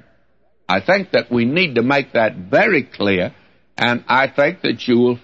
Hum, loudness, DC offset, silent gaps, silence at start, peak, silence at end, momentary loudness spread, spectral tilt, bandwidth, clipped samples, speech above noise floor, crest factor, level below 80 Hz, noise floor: none; -17 LUFS; 0.2%; none; 0.7 s; -2 dBFS; 0.05 s; 6 LU; -6.5 dB/octave; 7.8 kHz; under 0.1%; 46 dB; 14 dB; -58 dBFS; -63 dBFS